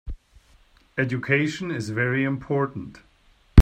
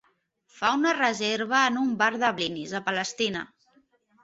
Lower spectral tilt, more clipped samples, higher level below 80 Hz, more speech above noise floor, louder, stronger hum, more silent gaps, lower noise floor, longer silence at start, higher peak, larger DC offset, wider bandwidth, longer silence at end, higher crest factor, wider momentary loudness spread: first, -7 dB/octave vs -3 dB/octave; neither; first, -46 dBFS vs -70 dBFS; second, 32 dB vs 42 dB; about the same, -25 LUFS vs -25 LUFS; neither; neither; second, -57 dBFS vs -68 dBFS; second, 0.05 s vs 0.55 s; first, 0 dBFS vs -8 dBFS; neither; first, 9.8 kHz vs 8.2 kHz; second, 0 s vs 0.75 s; about the same, 22 dB vs 20 dB; first, 18 LU vs 7 LU